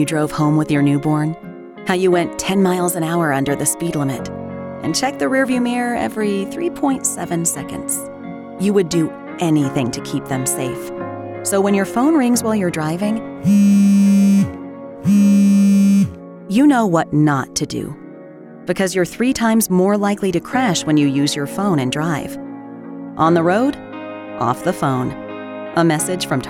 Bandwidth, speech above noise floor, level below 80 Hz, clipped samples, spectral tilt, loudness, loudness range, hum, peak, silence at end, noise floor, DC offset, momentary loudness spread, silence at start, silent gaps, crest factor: 16.5 kHz; 20 dB; -50 dBFS; under 0.1%; -5.5 dB/octave; -17 LUFS; 6 LU; none; -2 dBFS; 0 s; -37 dBFS; under 0.1%; 16 LU; 0 s; none; 16 dB